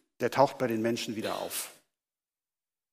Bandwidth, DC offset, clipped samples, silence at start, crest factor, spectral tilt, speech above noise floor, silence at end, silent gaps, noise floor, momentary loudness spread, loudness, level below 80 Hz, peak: 15.5 kHz; under 0.1%; under 0.1%; 0.2 s; 24 dB; -4.5 dB/octave; over 60 dB; 1.2 s; none; under -90 dBFS; 9 LU; -30 LUFS; -76 dBFS; -8 dBFS